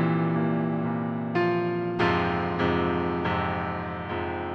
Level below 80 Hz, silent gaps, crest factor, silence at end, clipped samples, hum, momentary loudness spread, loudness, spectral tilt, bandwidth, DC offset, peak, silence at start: -50 dBFS; none; 16 dB; 0 s; under 0.1%; none; 6 LU; -27 LUFS; -8.5 dB/octave; 6.2 kHz; under 0.1%; -10 dBFS; 0 s